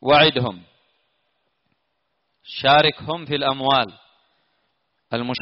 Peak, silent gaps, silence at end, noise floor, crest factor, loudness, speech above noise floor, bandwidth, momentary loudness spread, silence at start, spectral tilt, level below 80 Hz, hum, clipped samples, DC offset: -4 dBFS; none; 0.05 s; -73 dBFS; 18 dB; -19 LUFS; 54 dB; 5.8 kHz; 15 LU; 0 s; -2 dB/octave; -58 dBFS; none; under 0.1%; under 0.1%